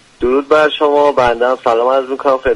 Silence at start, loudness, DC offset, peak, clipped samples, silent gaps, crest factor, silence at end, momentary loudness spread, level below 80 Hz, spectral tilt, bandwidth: 0.2 s; -13 LUFS; under 0.1%; 0 dBFS; under 0.1%; none; 12 dB; 0 s; 4 LU; -40 dBFS; -5 dB/octave; 11 kHz